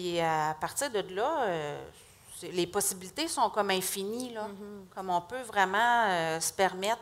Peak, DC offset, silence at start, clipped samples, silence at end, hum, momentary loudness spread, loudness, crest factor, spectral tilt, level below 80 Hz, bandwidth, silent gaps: -10 dBFS; under 0.1%; 0 s; under 0.1%; 0 s; none; 15 LU; -30 LUFS; 20 dB; -2.5 dB/octave; -66 dBFS; 16 kHz; none